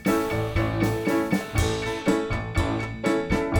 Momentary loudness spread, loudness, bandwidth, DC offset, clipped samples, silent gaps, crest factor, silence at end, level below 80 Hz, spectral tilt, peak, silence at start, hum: 2 LU; -25 LUFS; over 20 kHz; under 0.1%; under 0.1%; none; 16 dB; 0 s; -36 dBFS; -6 dB/octave; -8 dBFS; 0 s; none